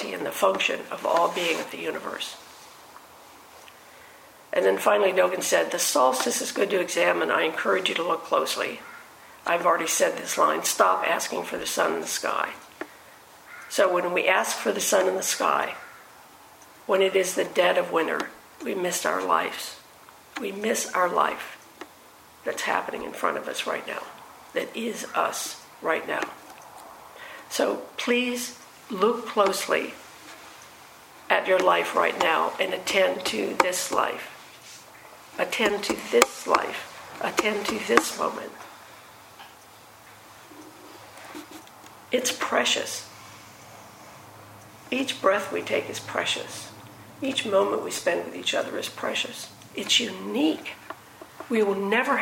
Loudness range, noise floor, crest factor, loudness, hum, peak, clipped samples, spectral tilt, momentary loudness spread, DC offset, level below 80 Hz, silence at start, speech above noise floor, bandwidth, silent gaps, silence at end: 6 LU; -51 dBFS; 26 dB; -25 LUFS; none; 0 dBFS; under 0.1%; -2 dB/octave; 23 LU; under 0.1%; -70 dBFS; 0 s; 26 dB; 16.5 kHz; none; 0 s